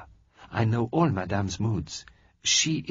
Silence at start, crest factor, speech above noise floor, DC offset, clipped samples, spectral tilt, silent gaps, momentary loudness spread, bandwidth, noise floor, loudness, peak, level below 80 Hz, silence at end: 0 s; 16 dB; 26 dB; under 0.1%; under 0.1%; -4.5 dB/octave; none; 12 LU; 7.8 kHz; -52 dBFS; -26 LUFS; -10 dBFS; -52 dBFS; 0 s